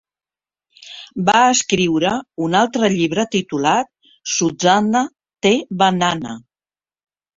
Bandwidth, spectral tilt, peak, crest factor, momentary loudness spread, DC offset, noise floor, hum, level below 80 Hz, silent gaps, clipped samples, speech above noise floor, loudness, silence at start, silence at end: 7.8 kHz; -3.5 dB/octave; -2 dBFS; 18 dB; 17 LU; under 0.1%; under -90 dBFS; none; -56 dBFS; none; under 0.1%; over 73 dB; -17 LUFS; 0.8 s; 1 s